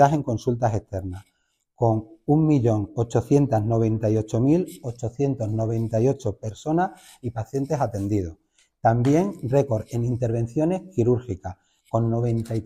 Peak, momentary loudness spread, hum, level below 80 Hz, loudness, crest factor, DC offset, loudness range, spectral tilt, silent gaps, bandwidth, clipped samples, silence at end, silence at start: -6 dBFS; 12 LU; none; -48 dBFS; -24 LUFS; 18 dB; under 0.1%; 4 LU; -8.5 dB/octave; none; 12.5 kHz; under 0.1%; 0 s; 0 s